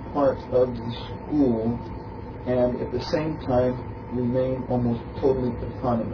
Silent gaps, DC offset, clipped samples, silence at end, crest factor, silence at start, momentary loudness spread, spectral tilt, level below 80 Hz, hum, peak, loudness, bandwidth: none; under 0.1%; under 0.1%; 0 s; 14 dB; 0 s; 10 LU; -9 dB/octave; -42 dBFS; none; -10 dBFS; -25 LUFS; 5.4 kHz